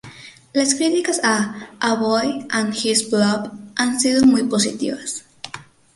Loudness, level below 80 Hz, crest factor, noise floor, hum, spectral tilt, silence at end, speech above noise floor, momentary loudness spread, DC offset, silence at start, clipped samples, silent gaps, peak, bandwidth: -19 LUFS; -58 dBFS; 16 dB; -41 dBFS; none; -3 dB/octave; 0.35 s; 23 dB; 15 LU; under 0.1%; 0.05 s; under 0.1%; none; -4 dBFS; 11.5 kHz